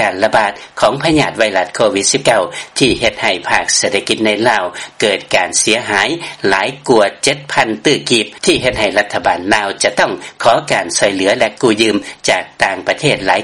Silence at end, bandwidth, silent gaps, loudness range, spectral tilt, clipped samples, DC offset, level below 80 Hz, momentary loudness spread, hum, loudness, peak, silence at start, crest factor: 0 s; 12.5 kHz; none; 1 LU; -2.5 dB/octave; 0.1%; 0.1%; -44 dBFS; 4 LU; none; -13 LUFS; 0 dBFS; 0 s; 14 dB